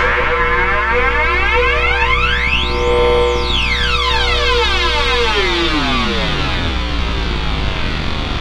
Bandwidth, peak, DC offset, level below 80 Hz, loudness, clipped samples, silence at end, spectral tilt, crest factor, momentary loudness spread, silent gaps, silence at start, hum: 11 kHz; 0 dBFS; under 0.1%; -20 dBFS; -14 LUFS; under 0.1%; 0 s; -4.5 dB/octave; 14 dB; 6 LU; none; 0 s; none